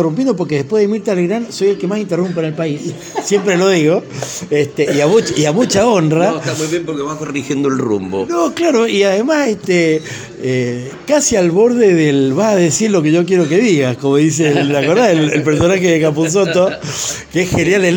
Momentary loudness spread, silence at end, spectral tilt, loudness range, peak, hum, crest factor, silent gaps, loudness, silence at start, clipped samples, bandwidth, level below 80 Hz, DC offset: 8 LU; 0 s; -5 dB/octave; 4 LU; 0 dBFS; none; 12 dB; none; -14 LUFS; 0 s; under 0.1%; 17 kHz; -48 dBFS; under 0.1%